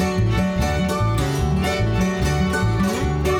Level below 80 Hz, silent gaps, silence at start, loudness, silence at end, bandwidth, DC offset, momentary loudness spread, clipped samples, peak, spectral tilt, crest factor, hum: -28 dBFS; none; 0 s; -20 LUFS; 0 s; 16.5 kHz; under 0.1%; 1 LU; under 0.1%; -8 dBFS; -6 dB/octave; 12 dB; none